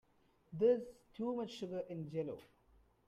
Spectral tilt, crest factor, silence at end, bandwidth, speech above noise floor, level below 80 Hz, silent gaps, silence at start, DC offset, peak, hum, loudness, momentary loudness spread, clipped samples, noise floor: -7.5 dB/octave; 20 dB; 0.65 s; 8.6 kHz; 32 dB; -74 dBFS; none; 0.5 s; under 0.1%; -22 dBFS; none; -39 LUFS; 19 LU; under 0.1%; -71 dBFS